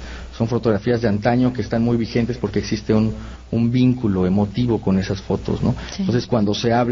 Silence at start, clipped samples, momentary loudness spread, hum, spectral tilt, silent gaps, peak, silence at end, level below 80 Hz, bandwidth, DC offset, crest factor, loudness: 0 s; under 0.1%; 6 LU; none; -7.5 dB/octave; none; -4 dBFS; 0 s; -38 dBFS; 7.4 kHz; under 0.1%; 14 dB; -20 LUFS